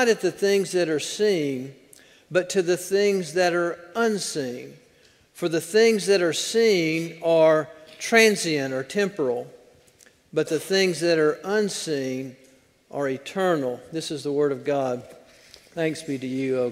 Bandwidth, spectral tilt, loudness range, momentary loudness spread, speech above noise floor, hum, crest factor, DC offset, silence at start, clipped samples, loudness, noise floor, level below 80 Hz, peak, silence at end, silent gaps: 16 kHz; -4 dB/octave; 6 LU; 12 LU; 35 dB; none; 22 dB; under 0.1%; 0 s; under 0.1%; -23 LUFS; -57 dBFS; -70 dBFS; -2 dBFS; 0 s; none